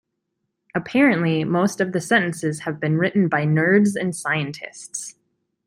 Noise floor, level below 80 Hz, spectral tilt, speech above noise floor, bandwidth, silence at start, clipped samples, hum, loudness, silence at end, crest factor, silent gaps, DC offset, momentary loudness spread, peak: -77 dBFS; -64 dBFS; -5.5 dB/octave; 56 dB; 15 kHz; 0.75 s; under 0.1%; none; -20 LUFS; 0.55 s; 18 dB; none; under 0.1%; 14 LU; -4 dBFS